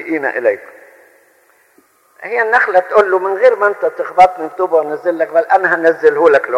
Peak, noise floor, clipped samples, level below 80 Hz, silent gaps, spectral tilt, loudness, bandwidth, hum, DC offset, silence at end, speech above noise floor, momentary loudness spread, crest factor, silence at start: 0 dBFS; -53 dBFS; under 0.1%; -58 dBFS; none; -5 dB/octave; -13 LUFS; 11.5 kHz; none; under 0.1%; 0 s; 40 dB; 8 LU; 14 dB; 0 s